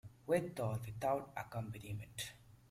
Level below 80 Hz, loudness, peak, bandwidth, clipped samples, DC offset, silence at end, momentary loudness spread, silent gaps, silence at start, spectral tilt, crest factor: -68 dBFS; -42 LUFS; -22 dBFS; 16 kHz; under 0.1%; under 0.1%; 0.15 s; 9 LU; none; 0.05 s; -5.5 dB/octave; 20 dB